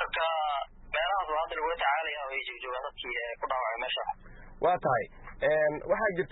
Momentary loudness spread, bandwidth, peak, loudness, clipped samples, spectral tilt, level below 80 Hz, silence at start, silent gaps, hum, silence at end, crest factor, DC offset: 8 LU; 4.1 kHz; -16 dBFS; -31 LUFS; under 0.1%; -8 dB/octave; -54 dBFS; 0 s; none; none; 0 s; 16 dB; under 0.1%